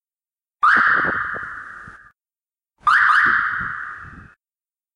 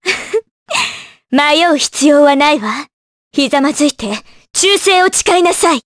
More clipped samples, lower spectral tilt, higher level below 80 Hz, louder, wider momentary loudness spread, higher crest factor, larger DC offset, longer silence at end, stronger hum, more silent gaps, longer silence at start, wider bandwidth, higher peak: neither; first, -3.5 dB/octave vs -1.5 dB/octave; about the same, -54 dBFS vs -50 dBFS; second, -17 LUFS vs -12 LUFS; first, 21 LU vs 12 LU; first, 18 dB vs 12 dB; neither; first, 0.7 s vs 0.05 s; neither; second, none vs 0.51-0.66 s, 2.93-3.31 s; first, 0.6 s vs 0.05 s; about the same, 11 kHz vs 11 kHz; second, -4 dBFS vs 0 dBFS